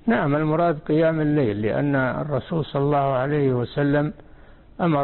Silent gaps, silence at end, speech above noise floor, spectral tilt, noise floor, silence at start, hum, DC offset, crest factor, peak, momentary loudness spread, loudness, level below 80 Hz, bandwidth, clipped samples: none; 0 s; 25 dB; -12.5 dB/octave; -46 dBFS; 0.05 s; none; under 0.1%; 12 dB; -10 dBFS; 5 LU; -22 LUFS; -48 dBFS; 4.3 kHz; under 0.1%